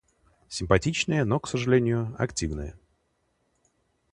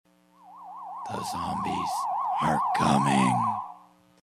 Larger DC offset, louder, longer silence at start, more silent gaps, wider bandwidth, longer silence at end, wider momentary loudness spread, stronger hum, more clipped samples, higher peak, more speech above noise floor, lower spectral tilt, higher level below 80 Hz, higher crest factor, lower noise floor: neither; about the same, -26 LUFS vs -26 LUFS; about the same, 0.5 s vs 0.45 s; neither; second, 11 kHz vs 15.5 kHz; first, 1.4 s vs 0.45 s; second, 13 LU vs 19 LU; second, none vs 60 Hz at -60 dBFS; neither; first, -4 dBFS vs -10 dBFS; first, 47 dB vs 29 dB; about the same, -5.5 dB/octave vs -5.5 dB/octave; first, -44 dBFS vs -62 dBFS; first, 24 dB vs 18 dB; first, -72 dBFS vs -55 dBFS